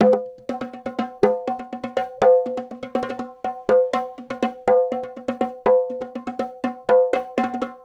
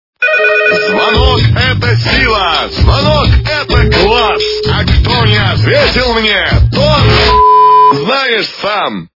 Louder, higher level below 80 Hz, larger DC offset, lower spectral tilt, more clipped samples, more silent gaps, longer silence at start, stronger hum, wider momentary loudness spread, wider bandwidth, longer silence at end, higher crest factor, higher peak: second, -22 LUFS vs -8 LUFS; second, -58 dBFS vs -18 dBFS; neither; about the same, -6.5 dB/octave vs -6 dB/octave; second, under 0.1% vs 0.5%; neither; second, 0 s vs 0.2 s; neither; first, 12 LU vs 6 LU; first, 8 kHz vs 6 kHz; about the same, 0.1 s vs 0.15 s; first, 18 dB vs 8 dB; about the same, -2 dBFS vs 0 dBFS